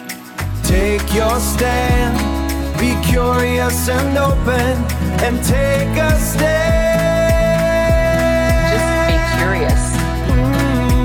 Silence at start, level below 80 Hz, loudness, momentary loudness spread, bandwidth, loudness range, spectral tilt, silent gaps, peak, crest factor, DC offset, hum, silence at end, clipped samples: 0 s; -20 dBFS; -15 LUFS; 4 LU; 19 kHz; 2 LU; -5.5 dB/octave; none; -4 dBFS; 12 dB; 0.3%; none; 0 s; under 0.1%